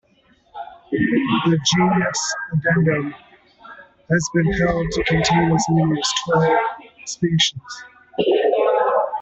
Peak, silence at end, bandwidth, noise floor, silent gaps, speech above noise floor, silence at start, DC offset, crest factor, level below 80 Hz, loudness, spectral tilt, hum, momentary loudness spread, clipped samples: -4 dBFS; 0 s; 8.2 kHz; -57 dBFS; none; 39 dB; 0.55 s; under 0.1%; 16 dB; -44 dBFS; -19 LUFS; -4.5 dB/octave; none; 14 LU; under 0.1%